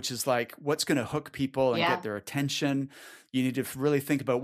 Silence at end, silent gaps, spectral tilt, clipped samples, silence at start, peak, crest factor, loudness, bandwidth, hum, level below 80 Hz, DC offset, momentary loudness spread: 0 s; none; -4.5 dB/octave; under 0.1%; 0 s; -12 dBFS; 18 dB; -29 LUFS; 15.5 kHz; none; -66 dBFS; under 0.1%; 7 LU